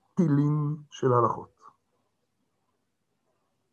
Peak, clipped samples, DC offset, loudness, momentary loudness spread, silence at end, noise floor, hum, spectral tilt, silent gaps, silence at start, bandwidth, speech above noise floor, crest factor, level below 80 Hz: -10 dBFS; under 0.1%; under 0.1%; -26 LUFS; 8 LU; 2.3 s; -78 dBFS; none; -9 dB/octave; none; 0.15 s; 7.2 kHz; 53 dB; 20 dB; -70 dBFS